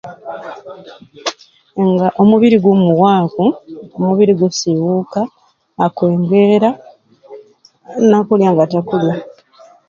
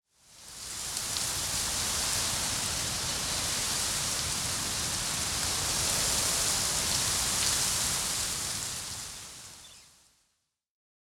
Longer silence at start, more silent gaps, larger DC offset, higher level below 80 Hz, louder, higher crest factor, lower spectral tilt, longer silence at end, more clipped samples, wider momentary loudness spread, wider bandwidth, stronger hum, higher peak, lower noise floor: second, 0.05 s vs 0.3 s; neither; neither; second, -58 dBFS vs -50 dBFS; first, -13 LUFS vs -28 LUFS; second, 14 dB vs 20 dB; first, -7 dB/octave vs -0.5 dB/octave; second, 0.6 s vs 1.25 s; neither; first, 18 LU vs 12 LU; second, 7.4 kHz vs 17.5 kHz; neither; first, 0 dBFS vs -12 dBFS; second, -45 dBFS vs -78 dBFS